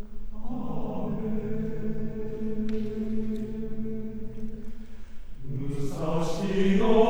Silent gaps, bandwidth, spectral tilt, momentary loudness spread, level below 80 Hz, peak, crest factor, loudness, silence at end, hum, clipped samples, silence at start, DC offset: none; 8.8 kHz; -7.5 dB/octave; 17 LU; -38 dBFS; -8 dBFS; 20 dB; -31 LUFS; 0 s; none; under 0.1%; 0 s; under 0.1%